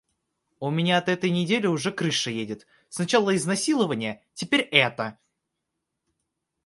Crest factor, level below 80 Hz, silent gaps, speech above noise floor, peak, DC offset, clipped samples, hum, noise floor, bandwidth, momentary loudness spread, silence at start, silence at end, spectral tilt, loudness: 26 dB; -70 dBFS; none; 57 dB; -2 dBFS; under 0.1%; under 0.1%; none; -82 dBFS; 11.5 kHz; 13 LU; 0.6 s; 1.55 s; -4 dB/octave; -24 LUFS